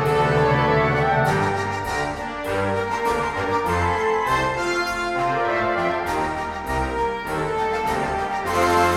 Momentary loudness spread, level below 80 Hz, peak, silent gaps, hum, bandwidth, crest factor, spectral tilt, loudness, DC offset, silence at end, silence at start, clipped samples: 7 LU; -40 dBFS; -6 dBFS; none; none; 16.5 kHz; 16 dB; -5.5 dB/octave; -22 LUFS; under 0.1%; 0 s; 0 s; under 0.1%